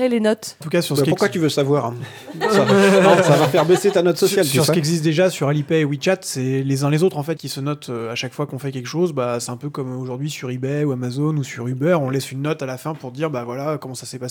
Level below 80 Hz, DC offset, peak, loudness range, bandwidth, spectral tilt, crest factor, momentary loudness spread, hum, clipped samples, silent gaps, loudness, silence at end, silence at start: -66 dBFS; under 0.1%; 0 dBFS; 8 LU; over 20 kHz; -5.5 dB/octave; 18 dB; 12 LU; none; under 0.1%; none; -19 LUFS; 0 s; 0 s